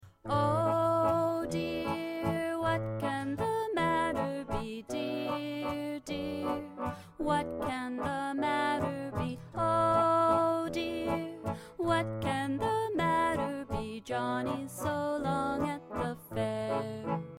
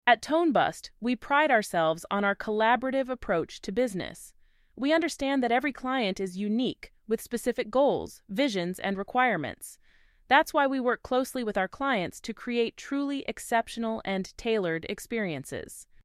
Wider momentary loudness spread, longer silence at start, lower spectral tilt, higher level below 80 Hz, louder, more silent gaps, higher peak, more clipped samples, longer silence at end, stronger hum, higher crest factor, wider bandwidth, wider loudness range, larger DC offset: about the same, 9 LU vs 10 LU; about the same, 0 s vs 0.05 s; first, -6 dB/octave vs -4.5 dB/octave; about the same, -56 dBFS vs -58 dBFS; second, -32 LUFS vs -28 LUFS; neither; second, -16 dBFS vs -6 dBFS; neither; second, 0 s vs 0.2 s; neither; second, 16 dB vs 22 dB; about the same, 16 kHz vs 15.5 kHz; about the same, 5 LU vs 4 LU; neither